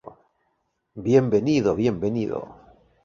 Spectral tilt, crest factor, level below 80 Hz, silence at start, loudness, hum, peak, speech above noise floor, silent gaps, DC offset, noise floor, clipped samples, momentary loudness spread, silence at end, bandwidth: -7.5 dB/octave; 20 dB; -54 dBFS; 0.05 s; -22 LUFS; none; -4 dBFS; 51 dB; none; under 0.1%; -73 dBFS; under 0.1%; 13 LU; 0.5 s; 7.4 kHz